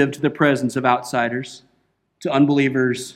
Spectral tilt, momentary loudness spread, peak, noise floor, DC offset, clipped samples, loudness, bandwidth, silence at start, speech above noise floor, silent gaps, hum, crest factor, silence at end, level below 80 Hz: -6 dB/octave; 11 LU; -2 dBFS; -66 dBFS; under 0.1%; under 0.1%; -19 LUFS; 14.5 kHz; 0 s; 47 dB; none; none; 18 dB; 0.05 s; -64 dBFS